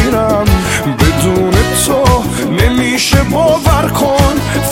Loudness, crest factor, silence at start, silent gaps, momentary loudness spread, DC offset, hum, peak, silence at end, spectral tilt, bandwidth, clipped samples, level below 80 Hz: -11 LUFS; 10 dB; 0 s; none; 2 LU; under 0.1%; none; 0 dBFS; 0 s; -5 dB/octave; 17.5 kHz; 0.3%; -20 dBFS